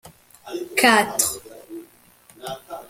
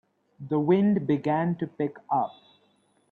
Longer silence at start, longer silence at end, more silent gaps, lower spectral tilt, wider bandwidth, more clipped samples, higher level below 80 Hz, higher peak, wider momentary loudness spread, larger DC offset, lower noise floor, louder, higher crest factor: second, 0.05 s vs 0.4 s; second, 0.05 s vs 0.85 s; neither; second, -1.5 dB/octave vs -10 dB/octave; first, 17 kHz vs 4.6 kHz; neither; first, -60 dBFS vs -70 dBFS; first, -2 dBFS vs -12 dBFS; first, 24 LU vs 10 LU; neither; second, -53 dBFS vs -66 dBFS; first, -18 LUFS vs -26 LUFS; first, 22 dB vs 16 dB